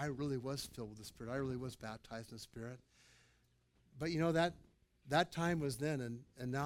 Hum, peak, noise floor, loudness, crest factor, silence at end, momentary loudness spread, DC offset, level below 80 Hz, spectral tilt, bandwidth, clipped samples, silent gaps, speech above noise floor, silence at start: none; -20 dBFS; -75 dBFS; -41 LUFS; 22 dB; 0 s; 15 LU; under 0.1%; -66 dBFS; -5.5 dB/octave; 17 kHz; under 0.1%; none; 34 dB; 0 s